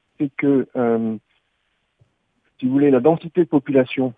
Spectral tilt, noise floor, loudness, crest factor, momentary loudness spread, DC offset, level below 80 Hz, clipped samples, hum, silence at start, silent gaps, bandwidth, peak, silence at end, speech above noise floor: -10 dB/octave; -69 dBFS; -19 LUFS; 18 dB; 11 LU; under 0.1%; -66 dBFS; under 0.1%; none; 0.2 s; none; 3.9 kHz; -2 dBFS; 0.05 s; 51 dB